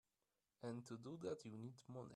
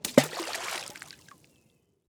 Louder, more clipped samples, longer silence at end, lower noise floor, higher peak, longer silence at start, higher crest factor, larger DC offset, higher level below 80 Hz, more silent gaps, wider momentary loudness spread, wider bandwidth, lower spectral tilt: second, -53 LUFS vs -30 LUFS; neither; second, 0 s vs 1 s; first, under -90 dBFS vs -68 dBFS; second, -36 dBFS vs -4 dBFS; first, 0.6 s vs 0.05 s; second, 18 dB vs 28 dB; neither; second, -88 dBFS vs -68 dBFS; neither; second, 6 LU vs 22 LU; second, 13 kHz vs over 20 kHz; first, -6.5 dB/octave vs -3.5 dB/octave